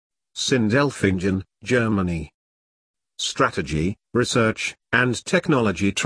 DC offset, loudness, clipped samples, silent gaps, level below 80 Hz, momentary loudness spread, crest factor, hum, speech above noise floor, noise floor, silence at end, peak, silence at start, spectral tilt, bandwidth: under 0.1%; -22 LUFS; under 0.1%; 2.34-2.94 s; -46 dBFS; 8 LU; 20 dB; none; over 69 dB; under -90 dBFS; 0 s; -2 dBFS; 0.35 s; -5 dB/octave; 10.5 kHz